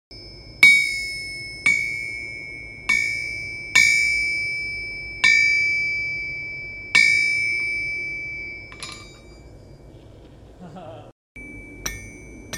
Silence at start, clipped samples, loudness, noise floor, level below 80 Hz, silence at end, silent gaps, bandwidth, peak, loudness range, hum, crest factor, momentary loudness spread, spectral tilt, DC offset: 0.1 s; under 0.1%; -19 LUFS; -45 dBFS; -48 dBFS; 0 s; 11.12-11.35 s; 16 kHz; 0 dBFS; 20 LU; none; 24 dB; 24 LU; -0.5 dB/octave; under 0.1%